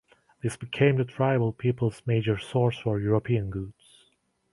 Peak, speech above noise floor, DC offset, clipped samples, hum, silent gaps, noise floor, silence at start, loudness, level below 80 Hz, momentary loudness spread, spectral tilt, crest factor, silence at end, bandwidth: -6 dBFS; 43 dB; under 0.1%; under 0.1%; none; none; -69 dBFS; 0.45 s; -27 LUFS; -54 dBFS; 11 LU; -7.5 dB/octave; 20 dB; 0.8 s; 11.5 kHz